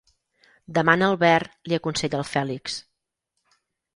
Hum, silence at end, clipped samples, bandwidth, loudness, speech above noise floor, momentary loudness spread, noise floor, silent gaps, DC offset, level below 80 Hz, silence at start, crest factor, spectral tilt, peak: none; 1.15 s; under 0.1%; 11.5 kHz; -23 LUFS; 57 dB; 12 LU; -79 dBFS; none; under 0.1%; -60 dBFS; 0.7 s; 22 dB; -5 dB/octave; -2 dBFS